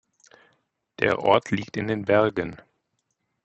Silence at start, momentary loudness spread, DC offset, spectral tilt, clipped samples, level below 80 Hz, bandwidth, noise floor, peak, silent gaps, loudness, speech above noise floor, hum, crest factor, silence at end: 1 s; 9 LU; under 0.1%; -6 dB/octave; under 0.1%; -62 dBFS; 8.4 kHz; -76 dBFS; -4 dBFS; none; -23 LUFS; 53 dB; none; 22 dB; 0.9 s